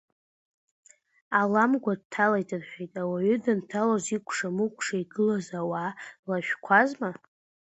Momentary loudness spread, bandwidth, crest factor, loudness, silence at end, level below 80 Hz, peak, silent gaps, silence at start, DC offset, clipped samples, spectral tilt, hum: 13 LU; 8.2 kHz; 22 dB; -27 LUFS; 0.5 s; -72 dBFS; -6 dBFS; 2.05-2.10 s, 6.19-6.23 s; 1.3 s; under 0.1%; under 0.1%; -5.5 dB/octave; none